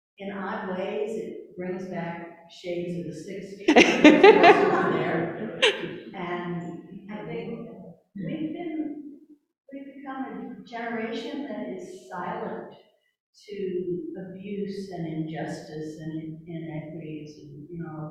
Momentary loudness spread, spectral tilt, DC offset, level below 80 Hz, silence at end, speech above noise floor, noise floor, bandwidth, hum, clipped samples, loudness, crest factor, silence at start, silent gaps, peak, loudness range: 23 LU; -5 dB/octave; under 0.1%; -64 dBFS; 0 s; 25 dB; -50 dBFS; 10.5 kHz; none; under 0.1%; -25 LUFS; 26 dB; 0.2 s; 13.20-13.33 s; 0 dBFS; 17 LU